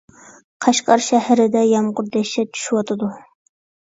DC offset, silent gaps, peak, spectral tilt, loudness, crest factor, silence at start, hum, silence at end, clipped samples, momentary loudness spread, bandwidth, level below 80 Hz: under 0.1%; none; 0 dBFS; -4 dB/octave; -18 LUFS; 18 dB; 0.6 s; none; 0.75 s; under 0.1%; 8 LU; 8 kHz; -66 dBFS